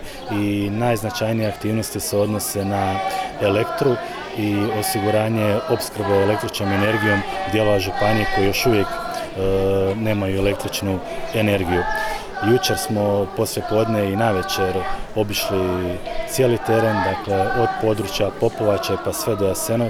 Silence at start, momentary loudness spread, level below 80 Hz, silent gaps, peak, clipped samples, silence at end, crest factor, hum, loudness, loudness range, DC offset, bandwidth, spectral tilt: 0 s; 6 LU; -38 dBFS; none; -6 dBFS; under 0.1%; 0 s; 14 dB; none; -20 LUFS; 2 LU; 0.1%; 19.5 kHz; -5 dB/octave